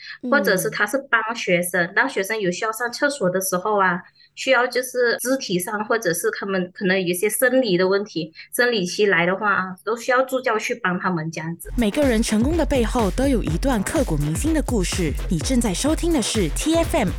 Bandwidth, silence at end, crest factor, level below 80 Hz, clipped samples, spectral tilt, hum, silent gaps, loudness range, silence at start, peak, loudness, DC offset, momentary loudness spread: 17.5 kHz; 0 s; 16 dB; -34 dBFS; under 0.1%; -4.5 dB/octave; none; none; 2 LU; 0 s; -4 dBFS; -21 LUFS; under 0.1%; 6 LU